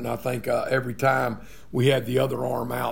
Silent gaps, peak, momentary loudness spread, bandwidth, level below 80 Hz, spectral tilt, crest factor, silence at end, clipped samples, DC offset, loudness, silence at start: none; -6 dBFS; 7 LU; 16.5 kHz; -54 dBFS; -6 dB/octave; 18 dB; 0 s; under 0.1%; 0.8%; -25 LUFS; 0 s